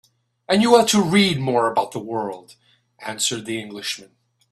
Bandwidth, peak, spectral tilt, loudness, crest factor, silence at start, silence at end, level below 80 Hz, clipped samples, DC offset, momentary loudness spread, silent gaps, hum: 13.5 kHz; 0 dBFS; -4 dB/octave; -19 LUFS; 22 dB; 0.5 s; 0.5 s; -60 dBFS; under 0.1%; under 0.1%; 17 LU; none; none